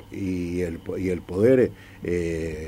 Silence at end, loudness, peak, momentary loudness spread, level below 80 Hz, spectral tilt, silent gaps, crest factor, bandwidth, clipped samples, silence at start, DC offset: 0 s; -25 LUFS; -8 dBFS; 11 LU; -46 dBFS; -7.5 dB/octave; none; 18 dB; 16 kHz; under 0.1%; 0 s; under 0.1%